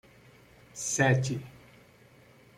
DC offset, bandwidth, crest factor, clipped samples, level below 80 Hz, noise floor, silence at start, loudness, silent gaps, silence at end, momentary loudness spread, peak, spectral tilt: under 0.1%; 14.5 kHz; 22 dB; under 0.1%; -64 dBFS; -58 dBFS; 0.75 s; -28 LUFS; none; 1 s; 22 LU; -12 dBFS; -4.5 dB/octave